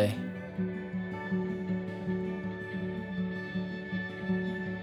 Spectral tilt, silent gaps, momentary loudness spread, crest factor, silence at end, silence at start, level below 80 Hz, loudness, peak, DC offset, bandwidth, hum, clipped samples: -8 dB/octave; none; 4 LU; 20 dB; 0 s; 0 s; -60 dBFS; -35 LUFS; -14 dBFS; under 0.1%; 12.5 kHz; none; under 0.1%